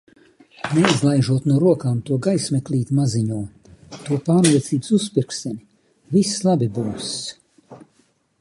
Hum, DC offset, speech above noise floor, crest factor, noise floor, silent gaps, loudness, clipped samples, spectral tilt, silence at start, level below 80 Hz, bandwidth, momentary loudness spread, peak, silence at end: none; under 0.1%; 43 dB; 20 dB; -62 dBFS; none; -20 LUFS; under 0.1%; -5.5 dB/octave; 0.65 s; -56 dBFS; 11.5 kHz; 14 LU; 0 dBFS; 0.65 s